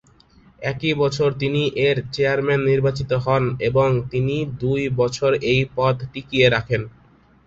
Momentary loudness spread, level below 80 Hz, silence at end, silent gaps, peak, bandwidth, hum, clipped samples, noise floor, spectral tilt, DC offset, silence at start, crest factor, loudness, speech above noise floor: 7 LU; -46 dBFS; 0.6 s; none; -2 dBFS; 7.8 kHz; none; under 0.1%; -52 dBFS; -6.5 dB/octave; under 0.1%; 0.6 s; 18 dB; -20 LUFS; 32 dB